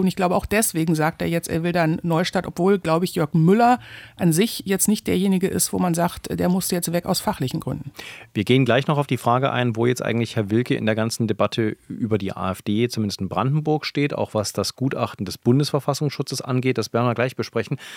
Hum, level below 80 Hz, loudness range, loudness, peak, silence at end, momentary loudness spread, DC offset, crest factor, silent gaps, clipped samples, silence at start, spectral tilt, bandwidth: none; -52 dBFS; 3 LU; -22 LUFS; -2 dBFS; 0 s; 7 LU; under 0.1%; 18 dB; none; under 0.1%; 0 s; -5.5 dB/octave; 18 kHz